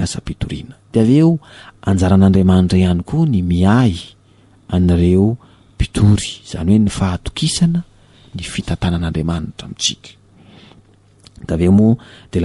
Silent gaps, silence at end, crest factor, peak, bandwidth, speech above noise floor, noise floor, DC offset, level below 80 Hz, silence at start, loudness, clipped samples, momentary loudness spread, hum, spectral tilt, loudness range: none; 0 s; 14 dB; -2 dBFS; 11.5 kHz; 34 dB; -49 dBFS; under 0.1%; -34 dBFS; 0 s; -15 LUFS; under 0.1%; 13 LU; none; -6.5 dB/octave; 8 LU